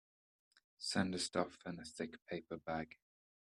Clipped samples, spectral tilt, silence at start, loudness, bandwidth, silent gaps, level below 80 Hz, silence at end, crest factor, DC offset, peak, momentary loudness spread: under 0.1%; -4 dB/octave; 0.8 s; -42 LUFS; 12.5 kHz; none; -74 dBFS; 0.55 s; 24 dB; under 0.1%; -20 dBFS; 11 LU